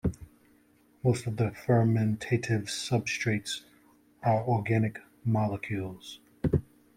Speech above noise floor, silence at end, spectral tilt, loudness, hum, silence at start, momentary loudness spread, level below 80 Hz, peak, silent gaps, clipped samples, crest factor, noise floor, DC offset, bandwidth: 35 dB; 0.35 s; -6 dB/octave; -30 LUFS; none; 0.05 s; 10 LU; -54 dBFS; -12 dBFS; none; under 0.1%; 18 dB; -63 dBFS; under 0.1%; 14.5 kHz